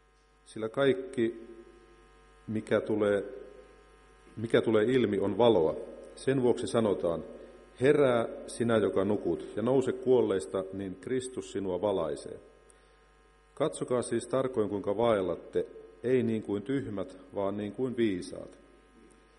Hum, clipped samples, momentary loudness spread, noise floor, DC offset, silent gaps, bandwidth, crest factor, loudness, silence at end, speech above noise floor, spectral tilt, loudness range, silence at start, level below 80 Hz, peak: none; under 0.1%; 15 LU; -62 dBFS; under 0.1%; none; 11.5 kHz; 20 dB; -30 LUFS; 0.85 s; 32 dB; -6 dB/octave; 6 LU; 0.5 s; -62 dBFS; -10 dBFS